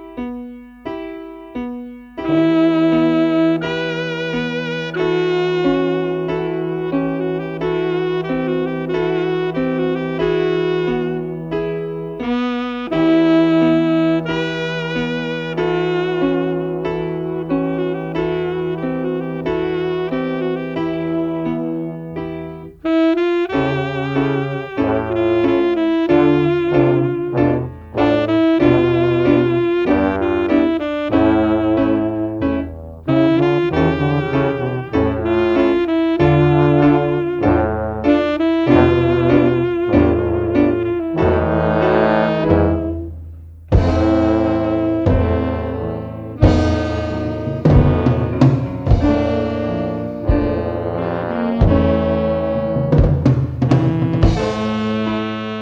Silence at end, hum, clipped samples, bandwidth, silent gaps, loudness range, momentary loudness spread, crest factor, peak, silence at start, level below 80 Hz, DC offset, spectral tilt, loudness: 0 s; none; under 0.1%; 7.2 kHz; none; 5 LU; 9 LU; 16 dB; 0 dBFS; 0 s; -30 dBFS; under 0.1%; -8.5 dB/octave; -17 LUFS